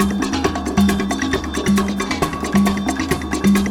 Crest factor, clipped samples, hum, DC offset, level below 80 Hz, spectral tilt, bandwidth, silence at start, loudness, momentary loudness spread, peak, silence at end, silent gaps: 14 dB; under 0.1%; none; under 0.1%; -32 dBFS; -5 dB/octave; 17.5 kHz; 0 s; -19 LUFS; 4 LU; -2 dBFS; 0 s; none